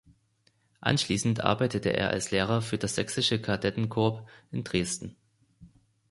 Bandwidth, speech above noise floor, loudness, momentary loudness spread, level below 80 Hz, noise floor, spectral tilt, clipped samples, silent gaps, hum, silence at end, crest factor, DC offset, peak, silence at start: 11.5 kHz; 41 dB; -28 LUFS; 8 LU; -54 dBFS; -69 dBFS; -4.5 dB/octave; under 0.1%; none; none; 0.45 s; 24 dB; under 0.1%; -6 dBFS; 0.8 s